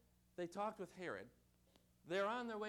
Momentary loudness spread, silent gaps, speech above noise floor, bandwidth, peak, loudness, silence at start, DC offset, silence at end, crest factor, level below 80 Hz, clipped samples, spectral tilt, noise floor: 14 LU; none; 29 dB; 18.5 kHz; -32 dBFS; -46 LUFS; 0.4 s; under 0.1%; 0 s; 16 dB; -80 dBFS; under 0.1%; -5 dB/octave; -74 dBFS